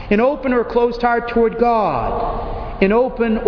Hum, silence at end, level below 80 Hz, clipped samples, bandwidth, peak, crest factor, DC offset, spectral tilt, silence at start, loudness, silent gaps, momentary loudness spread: none; 0 s; -32 dBFS; under 0.1%; 5.4 kHz; -2 dBFS; 16 dB; under 0.1%; -8.5 dB/octave; 0 s; -17 LUFS; none; 7 LU